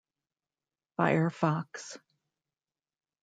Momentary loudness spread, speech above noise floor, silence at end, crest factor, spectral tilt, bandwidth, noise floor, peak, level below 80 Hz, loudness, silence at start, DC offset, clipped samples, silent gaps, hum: 18 LU; over 60 dB; 1.25 s; 24 dB; -6.5 dB/octave; 9.2 kHz; under -90 dBFS; -10 dBFS; -78 dBFS; -29 LUFS; 1 s; under 0.1%; under 0.1%; none; none